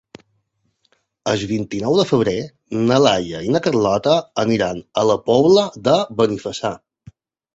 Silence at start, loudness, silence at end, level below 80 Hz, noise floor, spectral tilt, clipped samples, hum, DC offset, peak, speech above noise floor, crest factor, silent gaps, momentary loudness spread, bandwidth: 1.25 s; -18 LUFS; 0.8 s; -52 dBFS; -68 dBFS; -5.5 dB/octave; under 0.1%; none; under 0.1%; 0 dBFS; 51 dB; 18 dB; none; 10 LU; 8 kHz